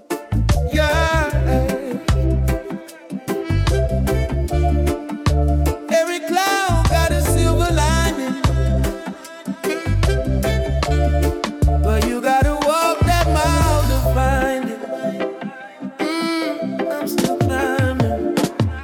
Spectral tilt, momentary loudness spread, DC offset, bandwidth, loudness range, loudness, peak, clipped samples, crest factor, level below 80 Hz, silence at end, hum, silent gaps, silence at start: -5.5 dB/octave; 9 LU; under 0.1%; 17.5 kHz; 4 LU; -19 LUFS; -4 dBFS; under 0.1%; 14 dB; -24 dBFS; 0 s; none; none; 0.1 s